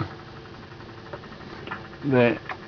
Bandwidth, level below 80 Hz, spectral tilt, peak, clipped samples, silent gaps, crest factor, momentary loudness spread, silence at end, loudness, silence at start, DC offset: 5.4 kHz; -56 dBFS; -8 dB/octave; -8 dBFS; under 0.1%; none; 22 dB; 21 LU; 0 s; -25 LUFS; 0 s; under 0.1%